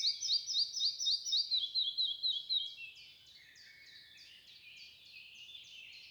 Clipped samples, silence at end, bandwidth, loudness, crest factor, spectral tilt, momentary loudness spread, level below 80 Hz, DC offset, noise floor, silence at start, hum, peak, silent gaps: under 0.1%; 0 s; over 20 kHz; -33 LUFS; 16 dB; 4 dB/octave; 23 LU; -86 dBFS; under 0.1%; -59 dBFS; 0 s; none; -24 dBFS; none